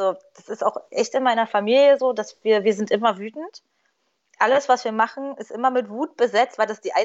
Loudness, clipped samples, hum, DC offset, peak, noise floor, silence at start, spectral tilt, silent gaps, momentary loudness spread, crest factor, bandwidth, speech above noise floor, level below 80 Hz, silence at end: -21 LUFS; under 0.1%; none; under 0.1%; -4 dBFS; -70 dBFS; 0 s; -4 dB/octave; none; 15 LU; 16 dB; 8 kHz; 49 dB; -84 dBFS; 0 s